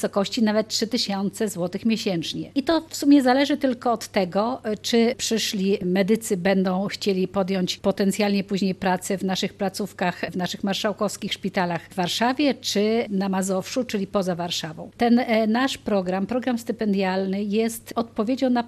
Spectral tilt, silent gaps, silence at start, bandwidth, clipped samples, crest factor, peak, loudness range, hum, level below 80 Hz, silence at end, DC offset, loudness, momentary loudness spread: -5 dB/octave; none; 0 s; 13 kHz; under 0.1%; 16 dB; -6 dBFS; 3 LU; none; -58 dBFS; 0 s; under 0.1%; -23 LUFS; 6 LU